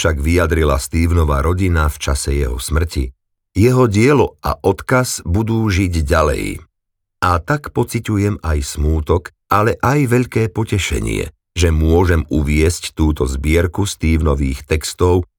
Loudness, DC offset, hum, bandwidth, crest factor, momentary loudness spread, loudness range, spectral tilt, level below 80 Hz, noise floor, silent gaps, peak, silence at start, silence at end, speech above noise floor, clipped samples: -16 LUFS; under 0.1%; none; 18.5 kHz; 14 dB; 6 LU; 2 LU; -6 dB/octave; -24 dBFS; -74 dBFS; none; -2 dBFS; 0 s; 0.15 s; 59 dB; under 0.1%